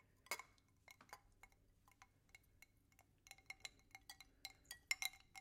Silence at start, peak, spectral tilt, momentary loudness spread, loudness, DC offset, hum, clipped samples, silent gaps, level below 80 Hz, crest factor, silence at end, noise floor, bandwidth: 0.25 s; -24 dBFS; 0.5 dB/octave; 25 LU; -51 LUFS; under 0.1%; none; under 0.1%; none; -78 dBFS; 32 dB; 0 s; -75 dBFS; 16.5 kHz